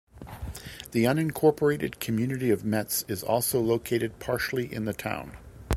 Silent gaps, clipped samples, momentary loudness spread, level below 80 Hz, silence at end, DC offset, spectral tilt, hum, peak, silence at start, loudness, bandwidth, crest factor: none; under 0.1%; 16 LU; -46 dBFS; 0 s; under 0.1%; -5 dB/octave; none; -4 dBFS; 0.15 s; -27 LUFS; 16.5 kHz; 22 dB